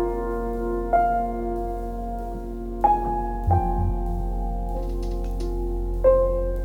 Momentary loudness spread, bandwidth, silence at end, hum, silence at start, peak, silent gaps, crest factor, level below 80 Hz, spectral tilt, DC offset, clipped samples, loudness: 10 LU; 6.2 kHz; 0 s; none; 0 s; -6 dBFS; none; 16 dB; -28 dBFS; -9 dB/octave; under 0.1%; under 0.1%; -25 LUFS